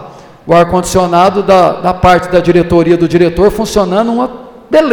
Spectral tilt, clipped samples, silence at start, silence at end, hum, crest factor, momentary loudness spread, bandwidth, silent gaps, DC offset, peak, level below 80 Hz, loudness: -6 dB/octave; 0.2%; 0 s; 0 s; none; 10 dB; 5 LU; 18.5 kHz; none; under 0.1%; 0 dBFS; -30 dBFS; -9 LUFS